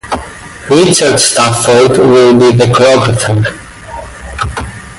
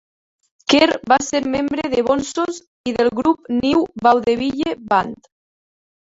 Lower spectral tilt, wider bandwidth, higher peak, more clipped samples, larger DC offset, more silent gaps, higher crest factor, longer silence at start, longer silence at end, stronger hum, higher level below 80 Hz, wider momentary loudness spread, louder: about the same, -4.5 dB/octave vs -4 dB/octave; first, 12 kHz vs 8 kHz; about the same, 0 dBFS vs -2 dBFS; neither; neither; second, none vs 2.67-2.84 s; second, 8 dB vs 18 dB; second, 0.05 s vs 0.7 s; second, 0 s vs 0.9 s; neither; first, -32 dBFS vs -52 dBFS; first, 20 LU vs 9 LU; first, -8 LUFS vs -18 LUFS